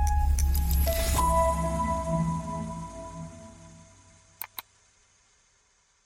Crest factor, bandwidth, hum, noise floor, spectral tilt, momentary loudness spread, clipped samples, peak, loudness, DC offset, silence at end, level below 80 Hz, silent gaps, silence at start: 16 dB; 16.5 kHz; none; -67 dBFS; -5.5 dB/octave; 19 LU; under 0.1%; -12 dBFS; -28 LUFS; under 0.1%; 1.45 s; -32 dBFS; none; 0 s